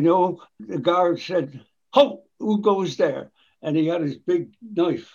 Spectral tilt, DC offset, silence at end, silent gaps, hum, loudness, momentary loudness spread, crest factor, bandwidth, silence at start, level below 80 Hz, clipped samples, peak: -7 dB/octave; under 0.1%; 0.1 s; none; none; -22 LUFS; 12 LU; 20 dB; 7.2 kHz; 0 s; -72 dBFS; under 0.1%; -4 dBFS